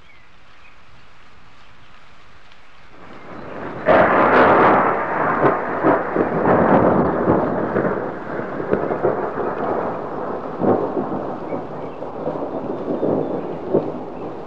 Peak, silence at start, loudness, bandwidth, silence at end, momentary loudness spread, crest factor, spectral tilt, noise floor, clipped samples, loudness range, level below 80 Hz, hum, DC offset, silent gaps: -2 dBFS; 3 s; -19 LUFS; 7.2 kHz; 0 s; 15 LU; 18 dB; -9 dB/octave; -49 dBFS; under 0.1%; 9 LU; -48 dBFS; none; 1%; none